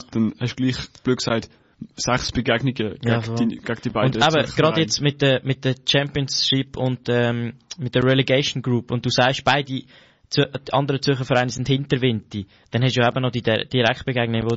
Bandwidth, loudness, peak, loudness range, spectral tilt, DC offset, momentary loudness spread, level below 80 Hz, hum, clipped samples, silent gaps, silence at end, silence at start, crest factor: 8 kHz; -21 LUFS; -6 dBFS; 3 LU; -4 dB/octave; under 0.1%; 7 LU; -48 dBFS; none; under 0.1%; none; 0 s; 0 s; 16 dB